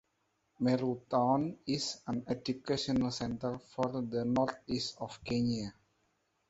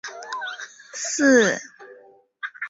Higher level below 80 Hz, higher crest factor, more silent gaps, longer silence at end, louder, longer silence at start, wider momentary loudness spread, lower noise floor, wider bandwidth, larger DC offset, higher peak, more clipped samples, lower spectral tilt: first, -62 dBFS vs -68 dBFS; about the same, 18 dB vs 20 dB; neither; first, 0.8 s vs 0 s; second, -34 LUFS vs -21 LUFS; first, 0.6 s vs 0.05 s; second, 8 LU vs 20 LU; first, -79 dBFS vs -52 dBFS; about the same, 8 kHz vs 8 kHz; neither; second, -16 dBFS vs -6 dBFS; neither; first, -5.5 dB/octave vs -2.5 dB/octave